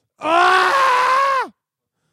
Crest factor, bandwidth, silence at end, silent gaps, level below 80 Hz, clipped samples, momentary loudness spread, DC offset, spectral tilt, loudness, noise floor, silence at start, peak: 16 dB; 15 kHz; 0.65 s; none; -68 dBFS; under 0.1%; 8 LU; under 0.1%; -1.5 dB/octave; -15 LUFS; -77 dBFS; 0.2 s; -2 dBFS